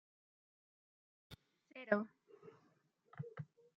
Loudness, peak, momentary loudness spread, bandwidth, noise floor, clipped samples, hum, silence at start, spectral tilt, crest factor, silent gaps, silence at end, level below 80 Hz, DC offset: -43 LUFS; -16 dBFS; 23 LU; 7 kHz; -76 dBFS; under 0.1%; none; 1.3 s; -5.5 dB/octave; 32 dB; none; 0.35 s; -84 dBFS; under 0.1%